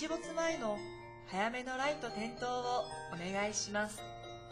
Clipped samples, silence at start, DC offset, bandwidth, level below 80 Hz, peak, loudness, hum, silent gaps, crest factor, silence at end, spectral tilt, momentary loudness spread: under 0.1%; 0 s; under 0.1%; 16 kHz; -64 dBFS; -22 dBFS; -38 LUFS; none; none; 16 dB; 0 s; -3 dB/octave; 10 LU